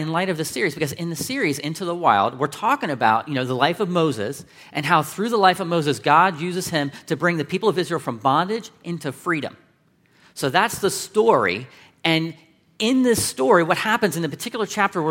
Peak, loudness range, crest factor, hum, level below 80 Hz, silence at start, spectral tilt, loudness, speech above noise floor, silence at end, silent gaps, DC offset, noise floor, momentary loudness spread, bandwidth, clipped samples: 0 dBFS; 4 LU; 20 dB; none; -62 dBFS; 0 s; -4.5 dB/octave; -21 LUFS; 39 dB; 0 s; none; under 0.1%; -60 dBFS; 10 LU; 16.5 kHz; under 0.1%